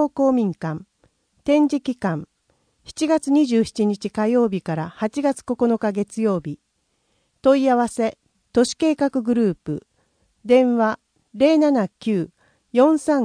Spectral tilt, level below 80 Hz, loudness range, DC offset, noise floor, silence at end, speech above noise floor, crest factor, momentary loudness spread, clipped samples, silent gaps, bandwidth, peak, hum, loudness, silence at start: -6 dB/octave; -58 dBFS; 3 LU; under 0.1%; -69 dBFS; 0 s; 49 dB; 16 dB; 13 LU; under 0.1%; none; 10.5 kHz; -4 dBFS; none; -20 LUFS; 0 s